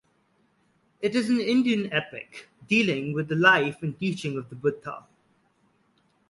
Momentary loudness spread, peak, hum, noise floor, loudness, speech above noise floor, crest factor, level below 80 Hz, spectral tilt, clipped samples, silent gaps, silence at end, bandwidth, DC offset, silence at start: 20 LU; -6 dBFS; none; -67 dBFS; -25 LUFS; 42 dB; 22 dB; -68 dBFS; -5.5 dB/octave; under 0.1%; none; 1.3 s; 11.5 kHz; under 0.1%; 1 s